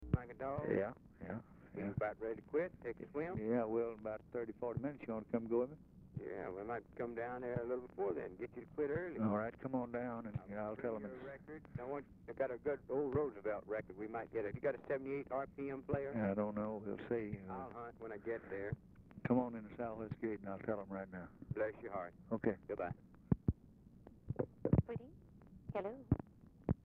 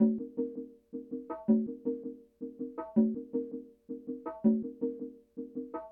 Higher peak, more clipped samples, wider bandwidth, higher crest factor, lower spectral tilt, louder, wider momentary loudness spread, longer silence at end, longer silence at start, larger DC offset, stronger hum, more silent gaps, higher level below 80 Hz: about the same, -18 dBFS vs -16 dBFS; neither; first, 4.5 kHz vs 2.4 kHz; first, 24 dB vs 18 dB; second, -9 dB/octave vs -12.5 dB/octave; second, -43 LUFS vs -34 LUFS; second, 11 LU vs 16 LU; about the same, 0.05 s vs 0 s; about the same, 0 s vs 0 s; neither; neither; neither; first, -60 dBFS vs -70 dBFS